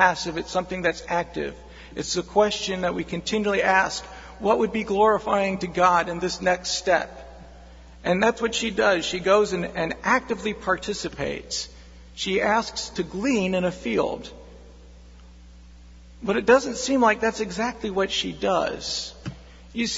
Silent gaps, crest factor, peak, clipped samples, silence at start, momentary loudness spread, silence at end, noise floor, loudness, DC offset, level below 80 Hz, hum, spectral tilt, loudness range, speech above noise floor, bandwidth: none; 22 dB; -2 dBFS; under 0.1%; 0 s; 12 LU; 0 s; -46 dBFS; -24 LUFS; under 0.1%; -48 dBFS; none; -3.5 dB/octave; 4 LU; 23 dB; 8 kHz